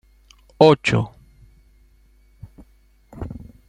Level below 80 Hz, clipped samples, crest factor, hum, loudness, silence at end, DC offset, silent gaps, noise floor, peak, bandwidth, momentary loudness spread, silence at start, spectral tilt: -48 dBFS; under 0.1%; 22 dB; none; -17 LUFS; 0.35 s; under 0.1%; none; -54 dBFS; -2 dBFS; 9.8 kHz; 21 LU; 0.6 s; -6.5 dB/octave